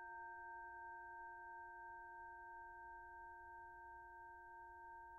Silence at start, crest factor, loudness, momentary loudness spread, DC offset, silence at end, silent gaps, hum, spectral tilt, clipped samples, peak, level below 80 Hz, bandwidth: 0 s; 10 dB; -56 LUFS; 4 LU; under 0.1%; 0 s; none; none; 3 dB/octave; under 0.1%; -46 dBFS; -76 dBFS; 2.5 kHz